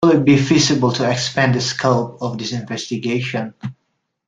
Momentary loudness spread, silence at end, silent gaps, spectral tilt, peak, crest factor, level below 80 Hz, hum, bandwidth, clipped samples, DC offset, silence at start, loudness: 12 LU; 0.55 s; none; -5 dB/octave; -2 dBFS; 16 dB; -52 dBFS; none; 9.4 kHz; under 0.1%; under 0.1%; 0 s; -17 LUFS